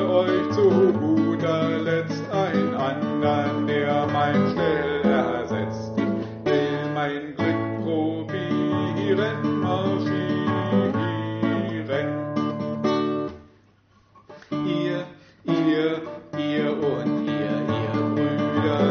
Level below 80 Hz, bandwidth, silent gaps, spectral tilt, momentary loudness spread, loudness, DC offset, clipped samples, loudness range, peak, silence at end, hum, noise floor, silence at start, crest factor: -60 dBFS; 6.8 kHz; none; -5.5 dB/octave; 6 LU; -24 LUFS; under 0.1%; under 0.1%; 5 LU; -8 dBFS; 0 s; none; -58 dBFS; 0 s; 16 dB